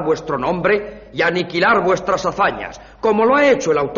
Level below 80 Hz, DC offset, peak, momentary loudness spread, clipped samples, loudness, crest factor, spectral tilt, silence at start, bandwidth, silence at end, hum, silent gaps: -46 dBFS; under 0.1%; -4 dBFS; 8 LU; under 0.1%; -17 LUFS; 14 dB; -3.5 dB/octave; 0 s; 7.4 kHz; 0 s; none; none